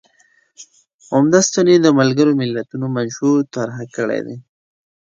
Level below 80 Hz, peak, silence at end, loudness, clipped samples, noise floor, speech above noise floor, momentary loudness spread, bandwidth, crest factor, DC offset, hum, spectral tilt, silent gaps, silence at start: -62 dBFS; 0 dBFS; 0.65 s; -16 LUFS; under 0.1%; -57 dBFS; 41 dB; 13 LU; 9 kHz; 16 dB; under 0.1%; none; -5 dB/octave; 0.94-0.99 s; 0.6 s